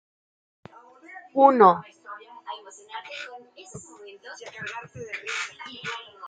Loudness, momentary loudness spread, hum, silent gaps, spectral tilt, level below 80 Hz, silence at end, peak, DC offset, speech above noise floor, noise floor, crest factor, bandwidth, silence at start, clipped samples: -23 LUFS; 26 LU; none; none; -4.5 dB/octave; -74 dBFS; 0 s; -4 dBFS; under 0.1%; 26 dB; -49 dBFS; 24 dB; 9.4 kHz; 1.1 s; under 0.1%